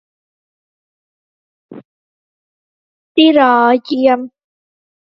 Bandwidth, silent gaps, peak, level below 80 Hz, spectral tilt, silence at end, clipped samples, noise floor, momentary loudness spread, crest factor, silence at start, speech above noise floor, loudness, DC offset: 5.8 kHz; 1.85-3.15 s; 0 dBFS; -64 dBFS; -6 dB/octave; 0.75 s; under 0.1%; under -90 dBFS; 10 LU; 16 dB; 1.7 s; over 79 dB; -12 LUFS; under 0.1%